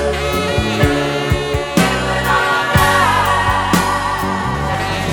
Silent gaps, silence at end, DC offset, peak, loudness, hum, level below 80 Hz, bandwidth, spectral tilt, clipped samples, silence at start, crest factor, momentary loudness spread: none; 0 s; under 0.1%; 0 dBFS; -15 LUFS; none; -28 dBFS; 19.5 kHz; -4.5 dB/octave; under 0.1%; 0 s; 14 dB; 6 LU